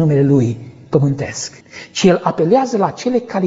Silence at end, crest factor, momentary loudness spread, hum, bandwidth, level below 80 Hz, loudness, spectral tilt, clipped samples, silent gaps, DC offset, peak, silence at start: 0 s; 16 dB; 13 LU; none; 8 kHz; -50 dBFS; -16 LUFS; -6.5 dB/octave; under 0.1%; none; under 0.1%; 0 dBFS; 0 s